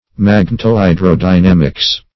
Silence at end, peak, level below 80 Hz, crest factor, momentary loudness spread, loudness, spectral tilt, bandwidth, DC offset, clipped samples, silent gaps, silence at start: 0.15 s; 0 dBFS; -28 dBFS; 10 dB; 3 LU; -11 LUFS; -7 dB/octave; 6 kHz; under 0.1%; 0.3%; none; 0.2 s